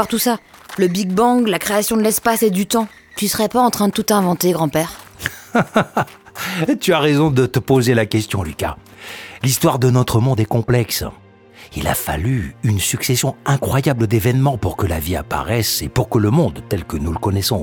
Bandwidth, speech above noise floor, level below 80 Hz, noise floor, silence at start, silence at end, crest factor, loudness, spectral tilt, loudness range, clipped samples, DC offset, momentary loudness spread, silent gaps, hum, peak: 19 kHz; 26 dB; -38 dBFS; -43 dBFS; 0 s; 0 s; 16 dB; -17 LUFS; -5 dB/octave; 2 LU; under 0.1%; under 0.1%; 10 LU; none; none; -2 dBFS